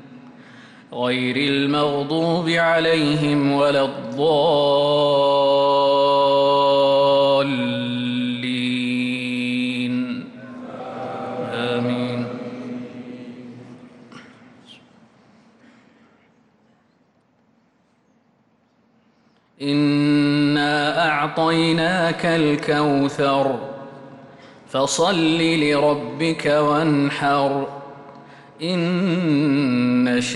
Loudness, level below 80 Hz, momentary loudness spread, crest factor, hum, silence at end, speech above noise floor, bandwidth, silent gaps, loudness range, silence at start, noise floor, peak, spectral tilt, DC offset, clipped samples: -19 LUFS; -62 dBFS; 15 LU; 12 dB; none; 0 s; 43 dB; 11.5 kHz; none; 11 LU; 0 s; -61 dBFS; -8 dBFS; -5.5 dB/octave; under 0.1%; under 0.1%